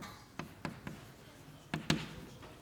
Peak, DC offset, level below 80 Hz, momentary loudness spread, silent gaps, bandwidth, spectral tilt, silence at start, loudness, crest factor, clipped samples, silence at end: -10 dBFS; under 0.1%; -62 dBFS; 19 LU; none; over 20 kHz; -4.5 dB/octave; 0 s; -42 LUFS; 32 dB; under 0.1%; 0 s